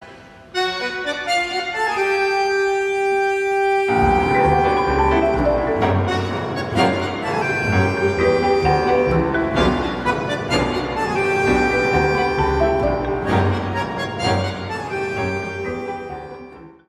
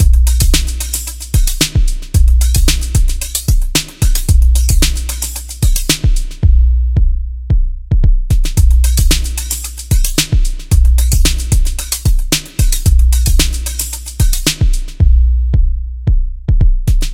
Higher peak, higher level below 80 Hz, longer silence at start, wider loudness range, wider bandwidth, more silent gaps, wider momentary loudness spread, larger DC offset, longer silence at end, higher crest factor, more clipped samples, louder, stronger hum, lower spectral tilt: second, -4 dBFS vs 0 dBFS; second, -34 dBFS vs -12 dBFS; about the same, 0 s vs 0 s; about the same, 3 LU vs 1 LU; second, 13 kHz vs 17 kHz; neither; about the same, 8 LU vs 7 LU; neither; first, 0.2 s vs 0 s; first, 16 dB vs 10 dB; neither; second, -19 LUFS vs -14 LUFS; neither; first, -6 dB/octave vs -3.5 dB/octave